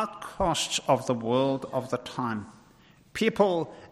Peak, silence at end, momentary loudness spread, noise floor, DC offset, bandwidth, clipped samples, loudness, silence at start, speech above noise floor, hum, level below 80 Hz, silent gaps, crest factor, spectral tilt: -8 dBFS; 0.05 s; 9 LU; -57 dBFS; under 0.1%; 15.5 kHz; under 0.1%; -28 LUFS; 0 s; 30 dB; none; -54 dBFS; none; 20 dB; -4.5 dB/octave